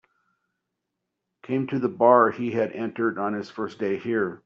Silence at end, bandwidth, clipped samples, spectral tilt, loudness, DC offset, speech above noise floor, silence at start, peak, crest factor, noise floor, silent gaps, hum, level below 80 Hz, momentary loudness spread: 0.1 s; 7.2 kHz; under 0.1%; -6 dB/octave; -24 LUFS; under 0.1%; 58 dB; 1.5 s; -4 dBFS; 20 dB; -82 dBFS; none; none; -72 dBFS; 12 LU